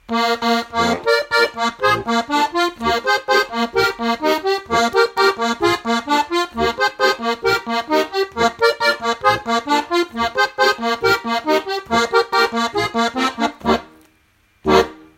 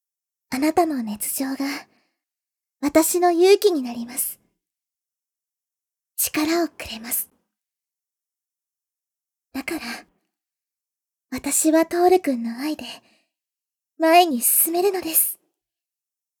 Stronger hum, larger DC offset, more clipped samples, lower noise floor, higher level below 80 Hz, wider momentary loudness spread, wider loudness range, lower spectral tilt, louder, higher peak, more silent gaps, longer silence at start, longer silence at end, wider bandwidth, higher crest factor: neither; neither; neither; second, -58 dBFS vs -89 dBFS; first, -46 dBFS vs -62 dBFS; second, 4 LU vs 17 LU; second, 1 LU vs 14 LU; first, -3.5 dB/octave vs -2 dB/octave; about the same, -18 LUFS vs -20 LUFS; about the same, 0 dBFS vs -2 dBFS; neither; second, 0.1 s vs 0.5 s; second, 0.2 s vs 1.05 s; second, 16.5 kHz vs over 20 kHz; about the same, 18 dB vs 22 dB